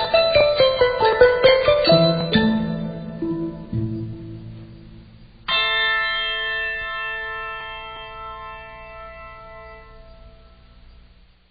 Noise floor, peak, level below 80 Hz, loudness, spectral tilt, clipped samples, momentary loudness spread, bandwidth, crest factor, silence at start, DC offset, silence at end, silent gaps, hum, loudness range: -51 dBFS; -2 dBFS; -44 dBFS; -19 LUFS; -2.5 dB/octave; under 0.1%; 22 LU; 5 kHz; 20 dB; 0 s; under 0.1%; 1.2 s; none; 60 Hz at -50 dBFS; 20 LU